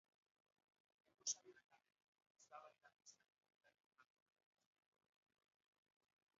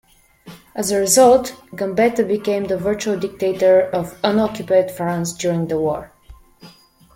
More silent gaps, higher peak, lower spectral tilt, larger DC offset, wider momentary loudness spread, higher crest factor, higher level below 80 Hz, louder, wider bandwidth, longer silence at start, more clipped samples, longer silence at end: first, 2.04-2.13 s, 2.30-2.35 s, 3.32-3.37 s, 3.86-3.91 s vs none; second, -32 dBFS vs -2 dBFS; second, 1.5 dB/octave vs -4.5 dB/octave; neither; first, 21 LU vs 10 LU; first, 30 dB vs 16 dB; second, under -90 dBFS vs -50 dBFS; second, -49 LUFS vs -18 LUFS; second, 7.4 kHz vs 16.5 kHz; first, 1.25 s vs 0.45 s; neither; first, 2.35 s vs 0.45 s